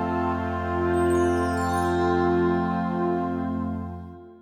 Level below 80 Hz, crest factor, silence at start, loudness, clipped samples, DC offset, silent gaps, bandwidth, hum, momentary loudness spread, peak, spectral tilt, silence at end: -44 dBFS; 14 dB; 0 s; -25 LUFS; under 0.1%; under 0.1%; none; 14 kHz; none; 9 LU; -12 dBFS; -7.5 dB/octave; 0.05 s